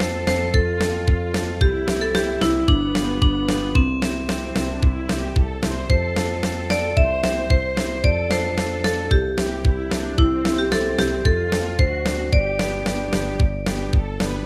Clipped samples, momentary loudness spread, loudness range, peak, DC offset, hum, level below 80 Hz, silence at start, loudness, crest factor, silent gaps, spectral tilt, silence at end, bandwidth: under 0.1%; 4 LU; 1 LU; -4 dBFS; under 0.1%; none; -24 dBFS; 0 s; -21 LUFS; 16 dB; none; -6 dB/octave; 0 s; 14.5 kHz